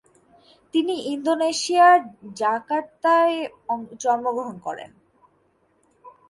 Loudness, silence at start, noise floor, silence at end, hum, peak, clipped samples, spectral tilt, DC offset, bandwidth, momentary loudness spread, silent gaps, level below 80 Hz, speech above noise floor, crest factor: -21 LUFS; 0.75 s; -64 dBFS; 0.2 s; none; -6 dBFS; under 0.1%; -3 dB/octave; under 0.1%; 11.5 kHz; 15 LU; none; -72 dBFS; 43 dB; 18 dB